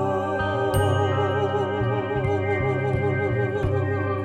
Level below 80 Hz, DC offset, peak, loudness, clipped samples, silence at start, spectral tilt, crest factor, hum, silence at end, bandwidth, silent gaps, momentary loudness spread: -42 dBFS; under 0.1%; -10 dBFS; -24 LUFS; under 0.1%; 0 s; -7 dB/octave; 14 dB; none; 0 s; 14 kHz; none; 3 LU